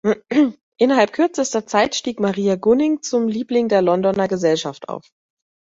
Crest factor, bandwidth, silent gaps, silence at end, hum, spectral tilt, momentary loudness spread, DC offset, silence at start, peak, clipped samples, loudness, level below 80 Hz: 16 dB; 8 kHz; 0.63-0.72 s; 0.75 s; none; -5 dB/octave; 6 LU; under 0.1%; 0.05 s; -2 dBFS; under 0.1%; -18 LUFS; -58 dBFS